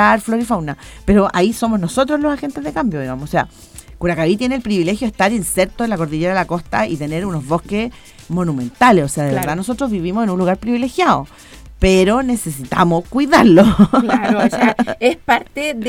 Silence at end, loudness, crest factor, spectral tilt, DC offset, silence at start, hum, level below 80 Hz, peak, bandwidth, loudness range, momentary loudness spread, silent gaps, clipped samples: 0 s; -16 LUFS; 16 dB; -5.5 dB/octave; under 0.1%; 0 s; none; -34 dBFS; 0 dBFS; 16.5 kHz; 6 LU; 9 LU; none; under 0.1%